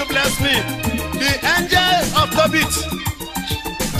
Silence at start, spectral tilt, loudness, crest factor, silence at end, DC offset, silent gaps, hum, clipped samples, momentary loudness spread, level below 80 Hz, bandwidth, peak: 0 s; -3 dB/octave; -17 LUFS; 16 dB; 0 s; under 0.1%; none; none; under 0.1%; 10 LU; -34 dBFS; 15.5 kHz; -2 dBFS